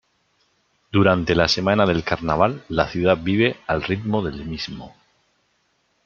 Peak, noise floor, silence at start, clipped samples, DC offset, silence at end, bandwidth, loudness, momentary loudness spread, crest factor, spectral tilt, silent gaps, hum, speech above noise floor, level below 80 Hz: -2 dBFS; -67 dBFS; 0.95 s; under 0.1%; under 0.1%; 1.15 s; 7.4 kHz; -20 LUFS; 11 LU; 20 dB; -6 dB/octave; none; none; 47 dB; -46 dBFS